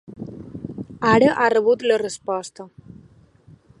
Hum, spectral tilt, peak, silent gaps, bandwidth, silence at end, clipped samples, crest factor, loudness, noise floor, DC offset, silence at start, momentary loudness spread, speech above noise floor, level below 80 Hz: none; -5.5 dB/octave; -2 dBFS; none; 11.5 kHz; 1.15 s; under 0.1%; 20 dB; -19 LUFS; -51 dBFS; under 0.1%; 0.1 s; 21 LU; 32 dB; -56 dBFS